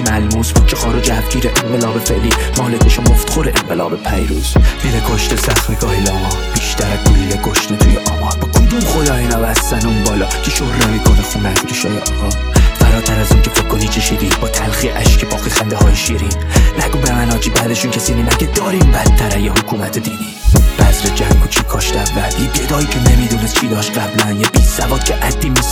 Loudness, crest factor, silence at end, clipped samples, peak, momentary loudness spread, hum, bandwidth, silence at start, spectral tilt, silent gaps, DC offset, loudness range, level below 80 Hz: -13 LUFS; 12 dB; 0 s; under 0.1%; 0 dBFS; 4 LU; none; 19 kHz; 0 s; -4.5 dB/octave; none; under 0.1%; 1 LU; -16 dBFS